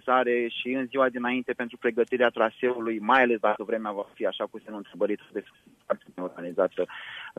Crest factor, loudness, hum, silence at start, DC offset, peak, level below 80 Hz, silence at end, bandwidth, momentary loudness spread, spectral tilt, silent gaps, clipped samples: 22 dB; -27 LUFS; none; 0.05 s; under 0.1%; -6 dBFS; -74 dBFS; 0.05 s; 10 kHz; 12 LU; -6 dB/octave; none; under 0.1%